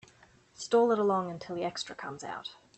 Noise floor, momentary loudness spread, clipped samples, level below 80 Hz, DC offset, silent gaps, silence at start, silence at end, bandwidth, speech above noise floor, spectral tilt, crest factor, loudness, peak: -61 dBFS; 15 LU; under 0.1%; -72 dBFS; under 0.1%; none; 0.6 s; 0.25 s; 8.6 kHz; 30 dB; -4.5 dB/octave; 16 dB; -31 LUFS; -16 dBFS